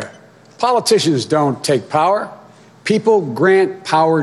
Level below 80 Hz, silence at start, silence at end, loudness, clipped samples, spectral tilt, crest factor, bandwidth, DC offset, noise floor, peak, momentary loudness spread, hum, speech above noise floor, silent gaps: -64 dBFS; 0 s; 0 s; -15 LUFS; under 0.1%; -5 dB/octave; 14 dB; 12.5 kHz; under 0.1%; -43 dBFS; -2 dBFS; 7 LU; none; 29 dB; none